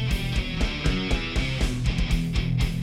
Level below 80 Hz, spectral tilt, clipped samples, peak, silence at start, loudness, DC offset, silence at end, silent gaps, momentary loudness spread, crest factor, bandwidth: -28 dBFS; -5.5 dB/octave; under 0.1%; -10 dBFS; 0 s; -26 LUFS; under 0.1%; 0 s; none; 2 LU; 14 dB; 15 kHz